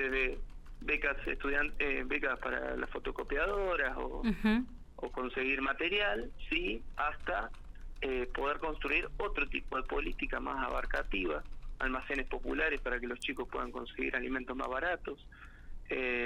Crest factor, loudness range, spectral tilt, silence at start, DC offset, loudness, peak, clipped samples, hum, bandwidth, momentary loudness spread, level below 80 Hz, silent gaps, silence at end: 18 dB; 3 LU; -5.5 dB/octave; 0 s; under 0.1%; -35 LUFS; -18 dBFS; under 0.1%; none; 10.5 kHz; 10 LU; -44 dBFS; none; 0 s